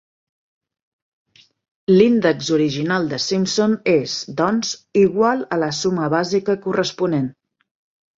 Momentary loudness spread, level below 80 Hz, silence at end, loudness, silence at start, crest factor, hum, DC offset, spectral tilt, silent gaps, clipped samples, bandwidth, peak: 7 LU; -60 dBFS; 0.9 s; -19 LUFS; 1.9 s; 18 dB; none; under 0.1%; -5 dB/octave; none; under 0.1%; 7.8 kHz; -2 dBFS